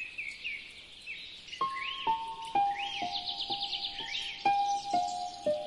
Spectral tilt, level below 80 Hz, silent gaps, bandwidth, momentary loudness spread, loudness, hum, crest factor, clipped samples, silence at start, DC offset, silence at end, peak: -1.5 dB/octave; -66 dBFS; none; 11.5 kHz; 11 LU; -34 LUFS; none; 18 dB; under 0.1%; 0 s; under 0.1%; 0 s; -18 dBFS